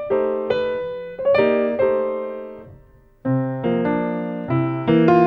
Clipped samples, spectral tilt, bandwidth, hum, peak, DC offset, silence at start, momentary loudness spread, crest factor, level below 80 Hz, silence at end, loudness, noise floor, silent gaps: under 0.1%; -9.5 dB/octave; 5.8 kHz; none; -2 dBFS; under 0.1%; 0 s; 13 LU; 18 dB; -54 dBFS; 0 s; -21 LUFS; -49 dBFS; none